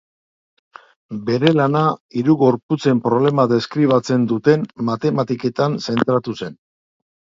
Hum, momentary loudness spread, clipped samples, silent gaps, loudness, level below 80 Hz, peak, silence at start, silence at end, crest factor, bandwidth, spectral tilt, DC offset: none; 7 LU; under 0.1%; 2.00-2.09 s, 2.63-2.69 s; -18 LUFS; -60 dBFS; 0 dBFS; 1.1 s; 0.75 s; 18 dB; 7.6 kHz; -7.5 dB/octave; under 0.1%